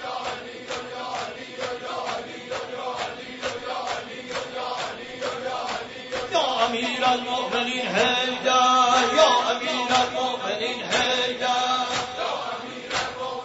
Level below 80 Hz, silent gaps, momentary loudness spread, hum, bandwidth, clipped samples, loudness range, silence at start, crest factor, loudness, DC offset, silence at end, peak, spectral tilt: -60 dBFS; none; 14 LU; none; 8 kHz; under 0.1%; 10 LU; 0 s; 20 dB; -24 LUFS; under 0.1%; 0 s; -4 dBFS; -2 dB/octave